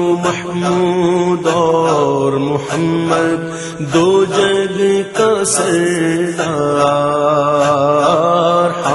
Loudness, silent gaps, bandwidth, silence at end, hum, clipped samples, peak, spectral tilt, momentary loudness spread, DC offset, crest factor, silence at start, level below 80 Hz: -14 LUFS; none; 11.5 kHz; 0 s; none; under 0.1%; 0 dBFS; -5 dB/octave; 5 LU; under 0.1%; 14 dB; 0 s; -52 dBFS